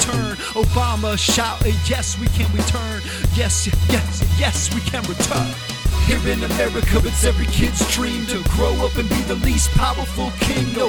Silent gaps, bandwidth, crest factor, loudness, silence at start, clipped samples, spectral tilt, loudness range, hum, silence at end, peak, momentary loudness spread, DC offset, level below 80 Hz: none; over 20 kHz; 16 dB; -19 LUFS; 0 s; under 0.1%; -4 dB/octave; 1 LU; none; 0 s; -2 dBFS; 5 LU; under 0.1%; -22 dBFS